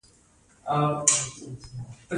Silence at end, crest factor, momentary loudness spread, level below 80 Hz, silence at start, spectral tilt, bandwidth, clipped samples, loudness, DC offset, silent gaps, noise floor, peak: 0 s; 28 dB; 20 LU; -58 dBFS; 0.65 s; -3 dB/octave; 11.5 kHz; under 0.1%; -24 LUFS; under 0.1%; none; -59 dBFS; -2 dBFS